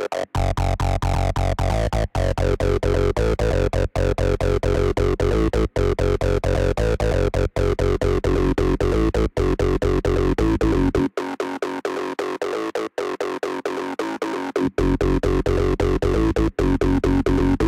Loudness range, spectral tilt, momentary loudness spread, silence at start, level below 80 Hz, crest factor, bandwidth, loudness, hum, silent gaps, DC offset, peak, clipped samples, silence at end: 4 LU; -7 dB/octave; 6 LU; 0 s; -26 dBFS; 12 dB; 13 kHz; -22 LUFS; none; none; under 0.1%; -8 dBFS; under 0.1%; 0 s